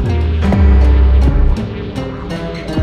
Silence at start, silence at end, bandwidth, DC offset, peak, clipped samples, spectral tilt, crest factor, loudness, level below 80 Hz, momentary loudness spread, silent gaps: 0 s; 0 s; 6 kHz; under 0.1%; 0 dBFS; under 0.1%; -8.5 dB/octave; 10 dB; -14 LUFS; -12 dBFS; 12 LU; none